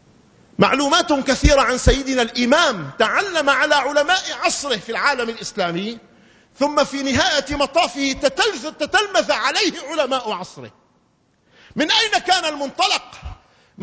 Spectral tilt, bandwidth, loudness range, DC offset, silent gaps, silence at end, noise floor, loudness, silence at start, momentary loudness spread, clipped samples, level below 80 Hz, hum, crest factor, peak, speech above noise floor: -3 dB/octave; 8 kHz; 4 LU; under 0.1%; none; 0 s; -61 dBFS; -18 LUFS; 0.6 s; 10 LU; under 0.1%; -34 dBFS; none; 20 dB; 0 dBFS; 42 dB